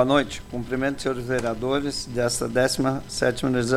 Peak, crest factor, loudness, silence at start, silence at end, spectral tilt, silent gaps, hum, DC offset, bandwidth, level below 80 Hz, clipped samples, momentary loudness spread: -6 dBFS; 18 dB; -25 LUFS; 0 s; 0 s; -4.5 dB/octave; none; none; under 0.1%; 16 kHz; -44 dBFS; under 0.1%; 6 LU